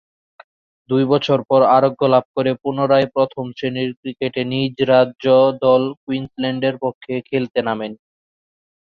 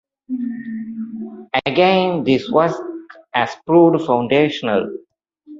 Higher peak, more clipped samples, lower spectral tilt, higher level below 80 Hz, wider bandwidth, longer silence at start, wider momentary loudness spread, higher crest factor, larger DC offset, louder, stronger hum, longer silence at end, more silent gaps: about the same, -2 dBFS vs -2 dBFS; neither; about the same, -8 dB/octave vs -7 dB/octave; about the same, -60 dBFS vs -58 dBFS; second, 6.6 kHz vs 7.6 kHz; first, 0.9 s vs 0.3 s; second, 11 LU vs 16 LU; about the same, 16 dB vs 18 dB; neither; about the same, -18 LUFS vs -17 LUFS; neither; first, 1.05 s vs 0 s; first, 2.25-2.34 s, 3.97-4.03 s, 5.97-6.07 s, 6.95-7.01 s vs none